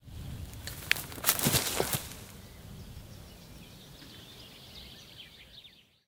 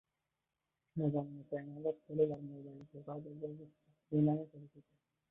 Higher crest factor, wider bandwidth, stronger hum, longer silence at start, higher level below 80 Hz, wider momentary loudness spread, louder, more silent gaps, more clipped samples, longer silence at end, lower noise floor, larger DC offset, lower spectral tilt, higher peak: first, 36 dB vs 20 dB; first, 18 kHz vs 3.8 kHz; neither; second, 0 s vs 0.95 s; first, -54 dBFS vs -76 dBFS; first, 23 LU vs 18 LU; first, -30 LUFS vs -39 LUFS; neither; neither; second, 0.25 s vs 0.5 s; second, -56 dBFS vs -89 dBFS; neither; second, -2.5 dB/octave vs -9.5 dB/octave; first, 0 dBFS vs -20 dBFS